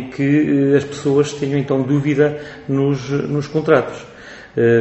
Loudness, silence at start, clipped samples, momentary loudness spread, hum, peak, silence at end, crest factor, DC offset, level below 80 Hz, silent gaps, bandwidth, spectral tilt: -17 LUFS; 0 s; under 0.1%; 13 LU; none; 0 dBFS; 0 s; 16 dB; under 0.1%; -52 dBFS; none; 8.2 kHz; -7.5 dB/octave